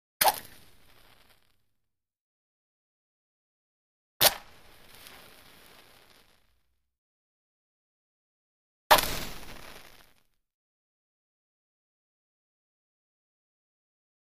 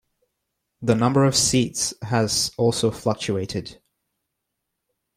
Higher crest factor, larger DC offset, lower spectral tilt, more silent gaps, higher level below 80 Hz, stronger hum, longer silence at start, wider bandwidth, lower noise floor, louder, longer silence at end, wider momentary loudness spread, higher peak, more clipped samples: first, 36 dB vs 20 dB; neither; second, -0.5 dB/octave vs -4 dB/octave; first, 2.21-4.20 s, 6.98-8.90 s vs none; about the same, -56 dBFS vs -54 dBFS; neither; second, 0.2 s vs 0.8 s; about the same, 15.5 kHz vs 16 kHz; about the same, -82 dBFS vs -80 dBFS; second, -25 LUFS vs -21 LUFS; first, 4.5 s vs 1.45 s; first, 26 LU vs 11 LU; first, 0 dBFS vs -4 dBFS; neither